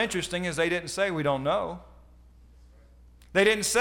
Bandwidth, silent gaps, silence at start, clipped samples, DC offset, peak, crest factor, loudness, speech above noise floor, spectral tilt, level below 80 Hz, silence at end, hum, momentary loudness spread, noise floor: over 20 kHz; none; 0 s; under 0.1%; under 0.1%; -12 dBFS; 16 dB; -26 LUFS; 27 dB; -3.5 dB/octave; -52 dBFS; 0 s; 60 Hz at -55 dBFS; 8 LU; -54 dBFS